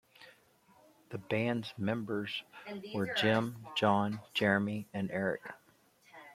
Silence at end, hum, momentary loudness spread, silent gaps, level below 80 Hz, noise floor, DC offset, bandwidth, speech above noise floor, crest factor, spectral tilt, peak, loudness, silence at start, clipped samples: 0 s; none; 16 LU; none; -74 dBFS; -66 dBFS; under 0.1%; 15 kHz; 32 dB; 22 dB; -6 dB/octave; -14 dBFS; -34 LUFS; 0.2 s; under 0.1%